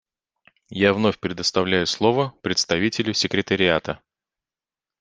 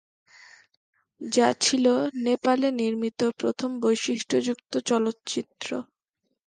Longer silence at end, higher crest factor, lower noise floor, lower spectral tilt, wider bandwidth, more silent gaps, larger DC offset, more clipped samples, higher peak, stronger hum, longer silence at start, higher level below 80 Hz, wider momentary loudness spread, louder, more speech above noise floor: first, 1.05 s vs 0.65 s; about the same, 22 dB vs 18 dB; first, under -90 dBFS vs -79 dBFS; about the same, -4 dB/octave vs -3 dB/octave; about the same, 10 kHz vs 10 kHz; neither; neither; neither; first, -2 dBFS vs -8 dBFS; neither; second, 0.7 s vs 1.2 s; first, -58 dBFS vs -74 dBFS; second, 5 LU vs 11 LU; first, -21 LUFS vs -25 LUFS; first, over 69 dB vs 54 dB